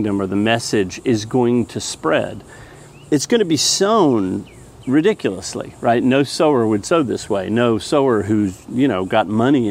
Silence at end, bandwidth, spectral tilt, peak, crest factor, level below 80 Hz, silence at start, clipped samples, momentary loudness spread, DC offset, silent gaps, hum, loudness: 0 s; 16 kHz; -4.5 dB/octave; 0 dBFS; 16 dB; -50 dBFS; 0 s; under 0.1%; 8 LU; under 0.1%; none; none; -17 LUFS